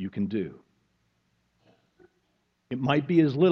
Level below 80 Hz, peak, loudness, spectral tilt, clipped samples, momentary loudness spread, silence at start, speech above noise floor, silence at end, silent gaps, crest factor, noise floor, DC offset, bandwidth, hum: -68 dBFS; -8 dBFS; -26 LUFS; -9 dB/octave; under 0.1%; 15 LU; 0 s; 49 dB; 0 s; none; 20 dB; -73 dBFS; under 0.1%; 6.2 kHz; none